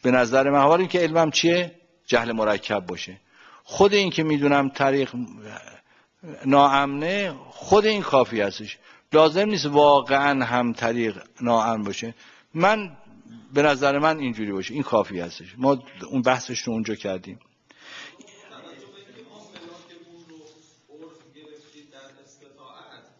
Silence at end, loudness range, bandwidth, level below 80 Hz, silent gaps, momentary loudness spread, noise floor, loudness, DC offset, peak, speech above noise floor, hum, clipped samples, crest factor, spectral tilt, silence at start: 1.65 s; 7 LU; 7.6 kHz; -60 dBFS; none; 18 LU; -53 dBFS; -21 LUFS; under 0.1%; -4 dBFS; 32 dB; none; under 0.1%; 20 dB; -5 dB/octave; 0.05 s